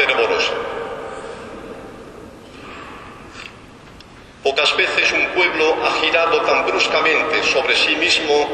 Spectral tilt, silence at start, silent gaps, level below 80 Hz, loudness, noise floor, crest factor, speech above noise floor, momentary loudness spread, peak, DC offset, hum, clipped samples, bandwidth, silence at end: -2 dB/octave; 0 s; none; -50 dBFS; -16 LUFS; -41 dBFS; 18 dB; 25 dB; 21 LU; 0 dBFS; under 0.1%; none; under 0.1%; 10.5 kHz; 0 s